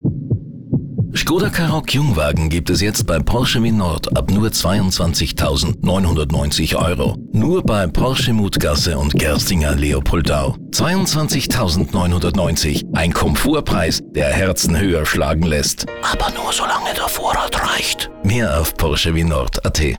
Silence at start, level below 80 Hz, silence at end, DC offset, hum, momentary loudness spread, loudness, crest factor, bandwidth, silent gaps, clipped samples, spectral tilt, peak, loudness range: 0 s; -26 dBFS; 0 s; 1%; none; 3 LU; -17 LUFS; 8 dB; over 20 kHz; none; under 0.1%; -4.5 dB/octave; -8 dBFS; 1 LU